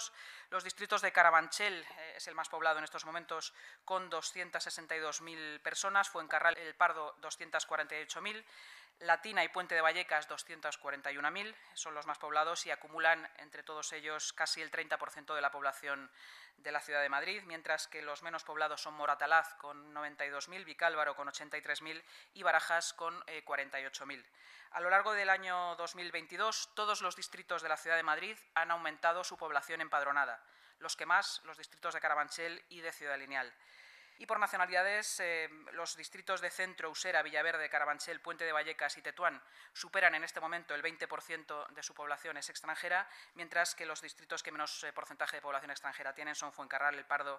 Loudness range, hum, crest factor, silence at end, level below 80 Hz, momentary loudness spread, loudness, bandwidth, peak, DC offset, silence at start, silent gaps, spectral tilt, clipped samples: 4 LU; none; 26 dB; 0 s; under -90 dBFS; 13 LU; -36 LUFS; 15.5 kHz; -12 dBFS; under 0.1%; 0 s; none; -0.5 dB/octave; under 0.1%